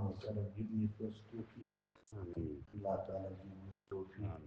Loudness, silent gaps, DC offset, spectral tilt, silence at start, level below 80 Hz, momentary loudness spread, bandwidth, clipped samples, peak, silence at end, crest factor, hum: -45 LUFS; none; under 0.1%; -9.5 dB/octave; 0 s; -66 dBFS; 14 LU; 7.4 kHz; under 0.1%; -26 dBFS; 0 s; 18 dB; none